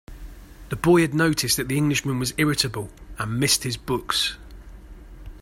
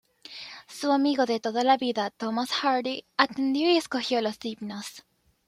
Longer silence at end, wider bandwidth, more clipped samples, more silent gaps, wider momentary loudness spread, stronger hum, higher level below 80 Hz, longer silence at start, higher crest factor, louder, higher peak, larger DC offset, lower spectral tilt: second, 0.05 s vs 0.5 s; about the same, 16 kHz vs 15 kHz; neither; neither; second, 14 LU vs 17 LU; neither; first, -44 dBFS vs -74 dBFS; second, 0.1 s vs 0.3 s; about the same, 18 dB vs 22 dB; first, -22 LUFS vs -26 LUFS; about the same, -6 dBFS vs -4 dBFS; neither; about the same, -4 dB/octave vs -3.5 dB/octave